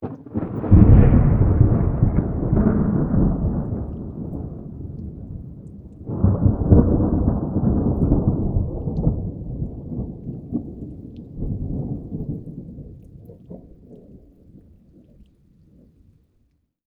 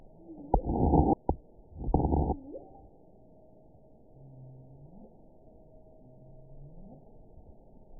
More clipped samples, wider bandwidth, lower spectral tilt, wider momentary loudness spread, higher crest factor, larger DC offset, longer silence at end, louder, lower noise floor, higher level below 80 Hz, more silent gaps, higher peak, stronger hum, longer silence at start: neither; first, 2.8 kHz vs 1 kHz; second, -14 dB/octave vs -16 dB/octave; second, 21 LU vs 28 LU; second, 20 dB vs 26 dB; neither; first, 2.7 s vs 0 s; first, -20 LUFS vs -30 LUFS; first, -65 dBFS vs -58 dBFS; first, -26 dBFS vs -40 dBFS; neither; first, 0 dBFS vs -8 dBFS; neither; second, 0 s vs 0.3 s